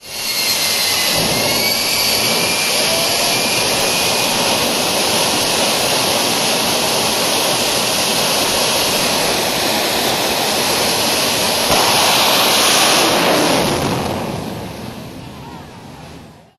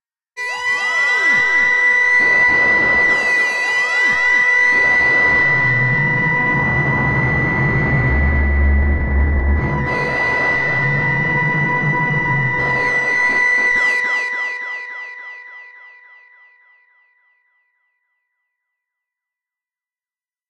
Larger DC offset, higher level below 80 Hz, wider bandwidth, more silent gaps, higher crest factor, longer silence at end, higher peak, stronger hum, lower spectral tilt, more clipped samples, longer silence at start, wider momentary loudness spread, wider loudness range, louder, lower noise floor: neither; second, -44 dBFS vs -26 dBFS; first, 16 kHz vs 10.5 kHz; neither; about the same, 14 dB vs 12 dB; second, 0.25 s vs 4.6 s; about the same, -2 dBFS vs -4 dBFS; neither; second, -1.5 dB/octave vs -5.5 dB/octave; neither; second, 0.05 s vs 0.35 s; first, 10 LU vs 7 LU; second, 2 LU vs 6 LU; about the same, -13 LUFS vs -14 LUFS; second, -38 dBFS vs under -90 dBFS